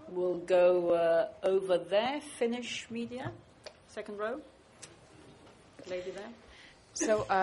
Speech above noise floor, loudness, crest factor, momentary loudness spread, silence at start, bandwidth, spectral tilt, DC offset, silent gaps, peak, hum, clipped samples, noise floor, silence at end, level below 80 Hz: 26 dB; -31 LUFS; 16 dB; 25 LU; 0 s; 11.5 kHz; -4 dB/octave; under 0.1%; none; -16 dBFS; none; under 0.1%; -57 dBFS; 0 s; -66 dBFS